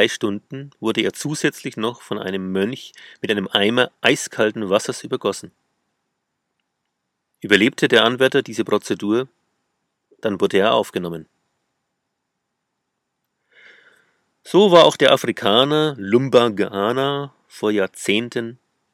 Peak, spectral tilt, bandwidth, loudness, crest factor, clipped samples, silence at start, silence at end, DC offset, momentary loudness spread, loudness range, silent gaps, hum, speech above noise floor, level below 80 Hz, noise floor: 0 dBFS; -4.5 dB/octave; 16 kHz; -18 LUFS; 20 dB; under 0.1%; 0 s; 0.4 s; under 0.1%; 13 LU; 8 LU; none; none; 58 dB; -68 dBFS; -77 dBFS